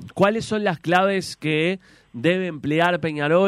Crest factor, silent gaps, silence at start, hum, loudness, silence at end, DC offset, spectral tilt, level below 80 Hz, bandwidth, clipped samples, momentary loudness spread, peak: 16 dB; none; 0 s; none; -21 LUFS; 0 s; under 0.1%; -6 dB/octave; -60 dBFS; 15 kHz; under 0.1%; 5 LU; -6 dBFS